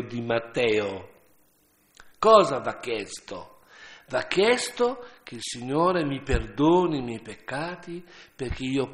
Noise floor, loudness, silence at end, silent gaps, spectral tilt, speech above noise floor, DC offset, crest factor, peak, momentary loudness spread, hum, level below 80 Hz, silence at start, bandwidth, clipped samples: -64 dBFS; -25 LUFS; 0 s; none; -5 dB/octave; 39 dB; under 0.1%; 24 dB; -2 dBFS; 19 LU; none; -44 dBFS; 0 s; 13 kHz; under 0.1%